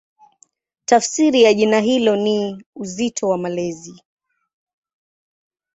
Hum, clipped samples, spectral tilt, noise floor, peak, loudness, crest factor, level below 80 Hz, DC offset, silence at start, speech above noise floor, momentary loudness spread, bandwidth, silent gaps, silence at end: none; under 0.1%; -4 dB/octave; -57 dBFS; -2 dBFS; -17 LUFS; 18 dB; -64 dBFS; under 0.1%; 0.9 s; 40 dB; 16 LU; 8.4 kHz; 2.66-2.73 s; 1.85 s